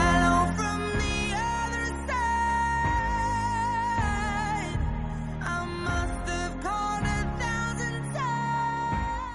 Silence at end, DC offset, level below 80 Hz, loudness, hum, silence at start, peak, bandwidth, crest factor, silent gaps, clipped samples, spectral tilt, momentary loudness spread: 0 s; under 0.1%; -36 dBFS; -28 LUFS; none; 0 s; -12 dBFS; 11.5 kHz; 16 dB; none; under 0.1%; -5 dB/octave; 5 LU